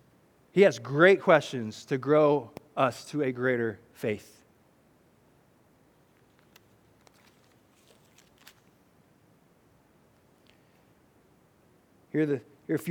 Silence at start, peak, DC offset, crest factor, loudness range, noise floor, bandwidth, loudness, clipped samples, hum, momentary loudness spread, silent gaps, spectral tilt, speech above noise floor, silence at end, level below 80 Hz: 0.55 s; -6 dBFS; under 0.1%; 24 dB; 18 LU; -63 dBFS; 17 kHz; -26 LUFS; under 0.1%; none; 14 LU; none; -6 dB/octave; 38 dB; 0 s; -76 dBFS